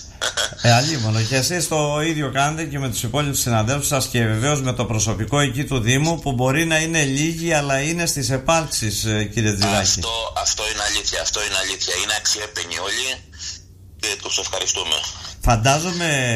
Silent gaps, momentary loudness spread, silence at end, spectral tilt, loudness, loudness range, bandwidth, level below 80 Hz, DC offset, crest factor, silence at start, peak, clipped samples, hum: none; 6 LU; 0 s; -3.5 dB/octave; -20 LUFS; 3 LU; 15.5 kHz; -38 dBFS; under 0.1%; 18 dB; 0 s; -4 dBFS; under 0.1%; none